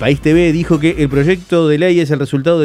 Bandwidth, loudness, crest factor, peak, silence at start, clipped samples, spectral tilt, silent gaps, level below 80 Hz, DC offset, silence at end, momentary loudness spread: 12.5 kHz; -13 LUFS; 12 dB; 0 dBFS; 0 s; under 0.1%; -7 dB/octave; none; -34 dBFS; under 0.1%; 0 s; 3 LU